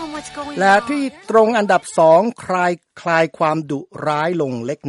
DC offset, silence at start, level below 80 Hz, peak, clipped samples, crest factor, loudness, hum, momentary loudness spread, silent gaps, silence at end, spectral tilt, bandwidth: under 0.1%; 0 s; -58 dBFS; -2 dBFS; under 0.1%; 16 dB; -17 LUFS; none; 12 LU; none; 0 s; -5.5 dB/octave; 11.5 kHz